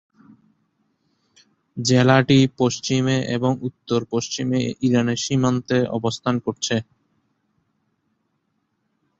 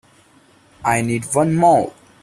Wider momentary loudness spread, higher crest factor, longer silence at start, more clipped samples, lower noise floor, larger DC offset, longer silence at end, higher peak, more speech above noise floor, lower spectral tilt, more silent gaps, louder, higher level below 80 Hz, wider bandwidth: about the same, 9 LU vs 9 LU; about the same, 20 dB vs 16 dB; first, 1.75 s vs 0.8 s; neither; first, -72 dBFS vs -52 dBFS; neither; first, 2.4 s vs 0.3 s; about the same, -2 dBFS vs -2 dBFS; first, 52 dB vs 36 dB; about the same, -5.5 dB/octave vs -6 dB/octave; neither; second, -20 LUFS vs -17 LUFS; second, -58 dBFS vs -52 dBFS; second, 8 kHz vs 15 kHz